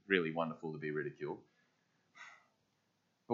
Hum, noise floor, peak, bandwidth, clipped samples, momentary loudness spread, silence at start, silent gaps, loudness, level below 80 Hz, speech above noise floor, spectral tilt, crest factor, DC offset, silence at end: none; -80 dBFS; -16 dBFS; 7.2 kHz; under 0.1%; 22 LU; 0.1 s; none; -40 LUFS; -86 dBFS; 42 dB; -7 dB/octave; 26 dB; under 0.1%; 0 s